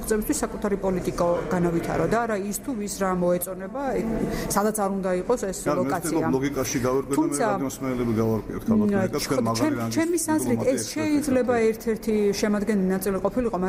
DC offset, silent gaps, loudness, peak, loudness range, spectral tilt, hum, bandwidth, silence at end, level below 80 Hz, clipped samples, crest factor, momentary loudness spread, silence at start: under 0.1%; none; -24 LUFS; -8 dBFS; 2 LU; -5.5 dB/octave; none; 16 kHz; 0 s; -44 dBFS; under 0.1%; 16 dB; 4 LU; 0 s